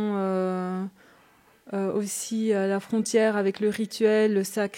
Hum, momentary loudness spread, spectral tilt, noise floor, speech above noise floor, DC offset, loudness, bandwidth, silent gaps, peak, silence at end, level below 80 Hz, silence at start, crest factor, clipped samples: none; 8 LU; -5 dB/octave; -59 dBFS; 34 dB; under 0.1%; -26 LUFS; 16.5 kHz; none; -10 dBFS; 0 s; -76 dBFS; 0 s; 16 dB; under 0.1%